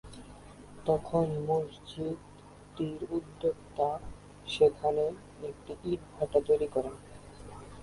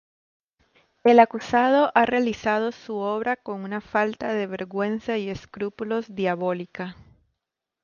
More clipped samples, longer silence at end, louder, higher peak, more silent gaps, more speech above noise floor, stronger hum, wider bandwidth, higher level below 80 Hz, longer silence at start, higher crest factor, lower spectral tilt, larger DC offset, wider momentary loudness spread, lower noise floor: neither; second, 0 s vs 0.9 s; second, -32 LUFS vs -24 LUFS; second, -12 dBFS vs -4 dBFS; neither; second, 19 dB vs 61 dB; first, 50 Hz at -55 dBFS vs none; first, 11.5 kHz vs 7.2 kHz; about the same, -56 dBFS vs -60 dBFS; second, 0.05 s vs 1.05 s; about the same, 20 dB vs 20 dB; about the same, -7 dB/octave vs -6 dB/octave; neither; first, 23 LU vs 14 LU; second, -50 dBFS vs -84 dBFS